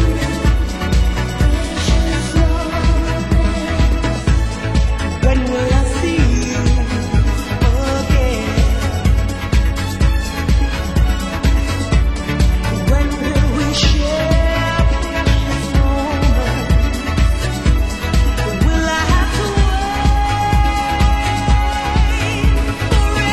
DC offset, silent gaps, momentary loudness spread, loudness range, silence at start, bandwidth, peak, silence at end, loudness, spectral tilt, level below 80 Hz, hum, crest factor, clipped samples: under 0.1%; none; 3 LU; 1 LU; 0 s; 13.5 kHz; 0 dBFS; 0 s; -16 LUFS; -5.5 dB/octave; -16 dBFS; none; 14 dB; under 0.1%